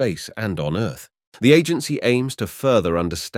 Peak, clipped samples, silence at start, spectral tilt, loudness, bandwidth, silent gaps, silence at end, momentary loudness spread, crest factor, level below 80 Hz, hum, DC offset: -2 dBFS; under 0.1%; 0 s; -5.5 dB/octave; -20 LUFS; 16.5 kHz; 1.27-1.32 s; 0 s; 11 LU; 18 dB; -48 dBFS; none; under 0.1%